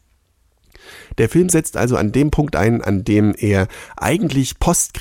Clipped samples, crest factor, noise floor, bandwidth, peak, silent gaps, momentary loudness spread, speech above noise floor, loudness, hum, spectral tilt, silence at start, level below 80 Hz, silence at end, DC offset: under 0.1%; 14 dB; -60 dBFS; 16.5 kHz; -4 dBFS; none; 4 LU; 44 dB; -17 LUFS; none; -5.5 dB/octave; 0.9 s; -34 dBFS; 0 s; under 0.1%